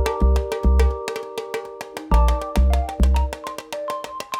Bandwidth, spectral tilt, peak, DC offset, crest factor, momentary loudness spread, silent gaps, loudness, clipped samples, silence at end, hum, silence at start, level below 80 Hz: 15 kHz; -6.5 dB/octave; -4 dBFS; under 0.1%; 16 dB; 11 LU; none; -22 LUFS; under 0.1%; 0 s; none; 0 s; -20 dBFS